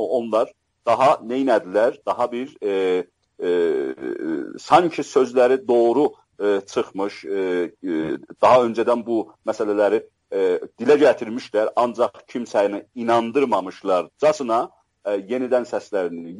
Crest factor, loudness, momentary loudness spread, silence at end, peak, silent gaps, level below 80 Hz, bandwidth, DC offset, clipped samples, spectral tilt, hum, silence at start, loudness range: 18 dB; -21 LUFS; 10 LU; 0 s; -2 dBFS; none; -68 dBFS; 11.5 kHz; under 0.1%; under 0.1%; -5.5 dB/octave; none; 0 s; 2 LU